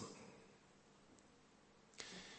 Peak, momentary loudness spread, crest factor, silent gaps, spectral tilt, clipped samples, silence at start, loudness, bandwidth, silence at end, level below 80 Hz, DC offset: -28 dBFS; 15 LU; 32 dB; none; -3 dB/octave; under 0.1%; 0 s; -60 LUFS; 8.4 kHz; 0 s; -82 dBFS; under 0.1%